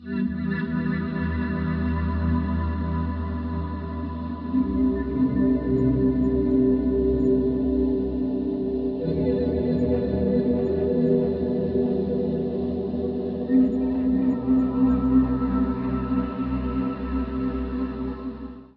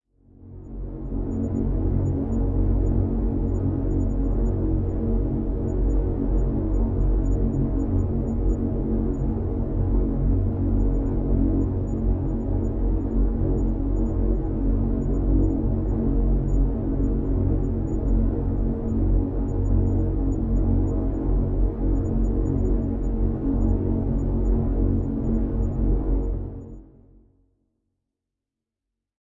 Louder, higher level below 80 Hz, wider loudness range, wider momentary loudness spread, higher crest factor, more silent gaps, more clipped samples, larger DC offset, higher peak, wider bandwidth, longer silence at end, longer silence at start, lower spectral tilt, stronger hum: about the same, -24 LUFS vs -25 LUFS; second, -36 dBFS vs -26 dBFS; about the same, 4 LU vs 2 LU; first, 7 LU vs 3 LU; about the same, 14 dB vs 12 dB; neither; neither; neither; about the same, -8 dBFS vs -10 dBFS; first, 4.6 kHz vs 2 kHz; second, 0.15 s vs 2.4 s; second, 0 s vs 0.4 s; about the same, -11.5 dB/octave vs -12 dB/octave; neither